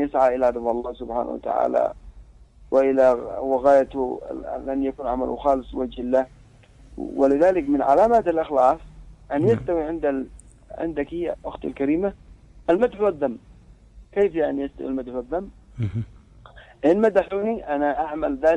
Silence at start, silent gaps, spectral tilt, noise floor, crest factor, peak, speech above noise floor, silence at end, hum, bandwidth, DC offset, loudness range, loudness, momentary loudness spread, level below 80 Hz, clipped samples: 0 s; none; -8 dB/octave; -49 dBFS; 18 dB; -4 dBFS; 28 dB; 0 s; none; 10 kHz; under 0.1%; 6 LU; -23 LUFS; 13 LU; -46 dBFS; under 0.1%